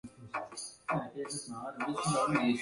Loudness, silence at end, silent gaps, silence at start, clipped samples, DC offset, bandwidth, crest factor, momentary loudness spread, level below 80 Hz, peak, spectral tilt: -35 LUFS; 0 s; none; 0.05 s; under 0.1%; under 0.1%; 11.5 kHz; 18 dB; 12 LU; -68 dBFS; -16 dBFS; -4.5 dB/octave